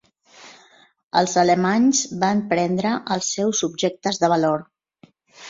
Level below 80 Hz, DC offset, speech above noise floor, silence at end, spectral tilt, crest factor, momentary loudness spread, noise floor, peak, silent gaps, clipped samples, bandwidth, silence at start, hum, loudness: -62 dBFS; under 0.1%; 35 dB; 0 s; -4 dB/octave; 18 dB; 6 LU; -55 dBFS; -4 dBFS; 1.03-1.11 s; under 0.1%; 7.8 kHz; 0.4 s; none; -20 LUFS